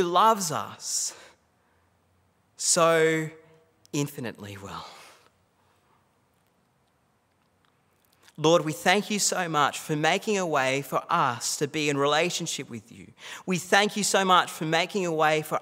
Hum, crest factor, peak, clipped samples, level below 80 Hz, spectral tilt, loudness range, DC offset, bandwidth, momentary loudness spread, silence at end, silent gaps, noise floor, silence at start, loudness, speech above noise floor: none; 24 dB; -4 dBFS; under 0.1%; -76 dBFS; -3 dB/octave; 13 LU; under 0.1%; 16 kHz; 17 LU; 0 s; none; -68 dBFS; 0 s; -25 LUFS; 43 dB